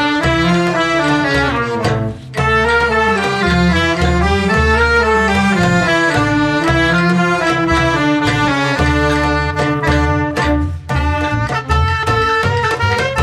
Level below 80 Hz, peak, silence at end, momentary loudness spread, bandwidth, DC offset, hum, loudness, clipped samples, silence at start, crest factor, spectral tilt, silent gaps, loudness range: -26 dBFS; -2 dBFS; 0 s; 4 LU; 13.5 kHz; under 0.1%; none; -14 LUFS; under 0.1%; 0 s; 12 dB; -5.5 dB/octave; none; 3 LU